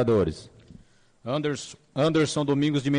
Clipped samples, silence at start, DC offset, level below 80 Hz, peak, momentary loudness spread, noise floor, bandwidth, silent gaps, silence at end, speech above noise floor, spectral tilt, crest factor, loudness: under 0.1%; 0 s; under 0.1%; -56 dBFS; -14 dBFS; 12 LU; -54 dBFS; 10 kHz; none; 0 s; 29 dB; -6 dB/octave; 12 dB; -26 LUFS